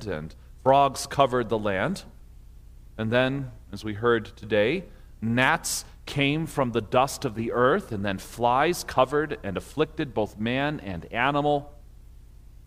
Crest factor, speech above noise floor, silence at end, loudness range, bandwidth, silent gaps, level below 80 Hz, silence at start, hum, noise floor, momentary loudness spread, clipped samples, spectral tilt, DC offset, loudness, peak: 20 dB; 22 dB; 0 s; 3 LU; 16 kHz; none; -48 dBFS; 0 s; 60 Hz at -50 dBFS; -47 dBFS; 11 LU; under 0.1%; -5 dB/octave; under 0.1%; -26 LUFS; -6 dBFS